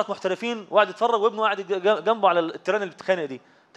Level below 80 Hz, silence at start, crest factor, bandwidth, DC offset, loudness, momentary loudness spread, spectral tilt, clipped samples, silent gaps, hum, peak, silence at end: -84 dBFS; 0 s; 18 dB; 9 kHz; under 0.1%; -23 LUFS; 6 LU; -4.5 dB/octave; under 0.1%; none; none; -6 dBFS; 0.4 s